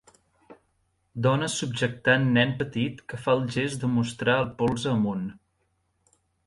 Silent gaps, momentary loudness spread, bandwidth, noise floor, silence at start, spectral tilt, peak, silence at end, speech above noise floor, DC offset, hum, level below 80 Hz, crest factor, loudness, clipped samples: none; 8 LU; 11.5 kHz; -72 dBFS; 0.5 s; -5.5 dB/octave; -8 dBFS; 1.15 s; 47 dB; under 0.1%; none; -58 dBFS; 18 dB; -26 LUFS; under 0.1%